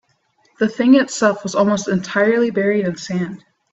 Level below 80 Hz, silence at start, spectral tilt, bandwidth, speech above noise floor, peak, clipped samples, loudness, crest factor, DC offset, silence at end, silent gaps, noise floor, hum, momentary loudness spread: -60 dBFS; 0.6 s; -5.5 dB/octave; 8.2 kHz; 44 dB; -2 dBFS; under 0.1%; -17 LUFS; 16 dB; under 0.1%; 0.35 s; none; -61 dBFS; none; 10 LU